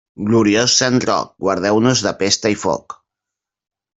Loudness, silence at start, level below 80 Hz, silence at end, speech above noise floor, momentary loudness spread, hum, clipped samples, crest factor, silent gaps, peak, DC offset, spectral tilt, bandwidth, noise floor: -16 LUFS; 0.2 s; -54 dBFS; 1.05 s; 68 dB; 8 LU; none; under 0.1%; 16 dB; none; -2 dBFS; under 0.1%; -3.5 dB/octave; 8.4 kHz; -84 dBFS